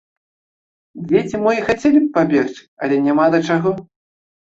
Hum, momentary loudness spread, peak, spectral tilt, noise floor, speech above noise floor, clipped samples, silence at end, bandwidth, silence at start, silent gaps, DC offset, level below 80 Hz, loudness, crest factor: none; 11 LU; -2 dBFS; -7 dB/octave; under -90 dBFS; over 74 dB; under 0.1%; 0.75 s; 7.8 kHz; 0.95 s; 2.68-2.77 s; under 0.1%; -54 dBFS; -17 LUFS; 16 dB